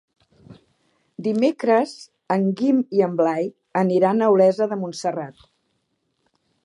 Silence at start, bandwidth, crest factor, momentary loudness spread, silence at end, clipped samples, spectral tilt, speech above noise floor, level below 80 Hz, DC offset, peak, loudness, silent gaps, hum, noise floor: 0.5 s; 11 kHz; 18 dB; 12 LU; 1.35 s; under 0.1%; -7 dB/octave; 52 dB; -72 dBFS; under 0.1%; -4 dBFS; -21 LUFS; none; none; -72 dBFS